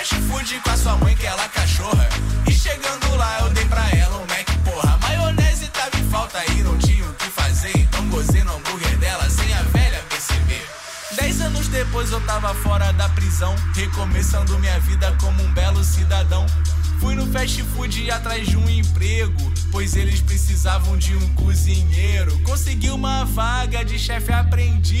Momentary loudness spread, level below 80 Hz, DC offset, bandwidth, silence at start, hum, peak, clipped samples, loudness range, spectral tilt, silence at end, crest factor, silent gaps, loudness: 4 LU; -20 dBFS; under 0.1%; 16 kHz; 0 s; none; -6 dBFS; under 0.1%; 2 LU; -4.5 dB/octave; 0 s; 10 dB; none; -20 LUFS